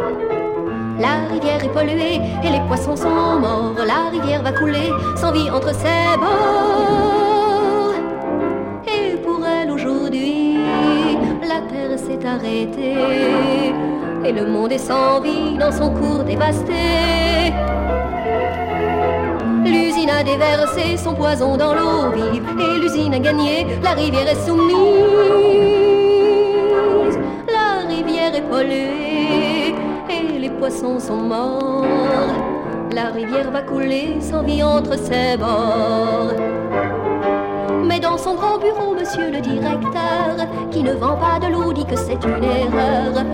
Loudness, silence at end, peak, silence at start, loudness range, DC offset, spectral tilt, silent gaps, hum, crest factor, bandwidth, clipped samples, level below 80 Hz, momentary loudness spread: -17 LUFS; 0 s; -2 dBFS; 0 s; 5 LU; under 0.1%; -6 dB/octave; none; none; 14 dB; 16.5 kHz; under 0.1%; -36 dBFS; 6 LU